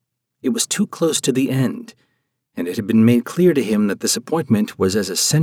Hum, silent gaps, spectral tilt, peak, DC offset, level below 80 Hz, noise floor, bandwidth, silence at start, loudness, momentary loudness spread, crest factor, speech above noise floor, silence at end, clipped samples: none; none; -4.5 dB/octave; -4 dBFS; under 0.1%; -64 dBFS; -70 dBFS; 17 kHz; 0.45 s; -18 LUFS; 10 LU; 16 dB; 52 dB; 0 s; under 0.1%